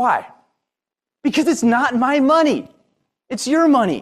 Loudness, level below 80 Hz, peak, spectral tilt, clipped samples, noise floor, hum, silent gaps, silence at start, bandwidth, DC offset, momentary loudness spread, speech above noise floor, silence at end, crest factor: -17 LUFS; -62 dBFS; -4 dBFS; -4.5 dB/octave; under 0.1%; -87 dBFS; none; none; 0 s; 13.5 kHz; under 0.1%; 11 LU; 71 dB; 0 s; 14 dB